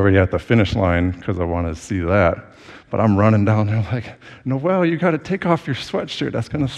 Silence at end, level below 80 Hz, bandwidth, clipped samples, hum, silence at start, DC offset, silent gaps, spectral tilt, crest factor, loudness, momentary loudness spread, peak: 0 s; -40 dBFS; 9.6 kHz; under 0.1%; none; 0 s; under 0.1%; none; -7.5 dB/octave; 18 dB; -19 LUFS; 10 LU; 0 dBFS